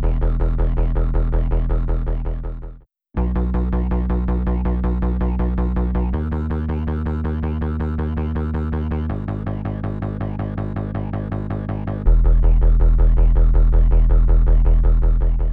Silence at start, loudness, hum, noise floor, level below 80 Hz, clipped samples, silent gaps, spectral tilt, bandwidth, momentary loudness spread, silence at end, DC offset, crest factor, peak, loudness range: 0 s; -21 LUFS; none; -39 dBFS; -18 dBFS; under 0.1%; none; -11.5 dB/octave; 3.1 kHz; 8 LU; 0 s; 0.5%; 14 dB; -4 dBFS; 7 LU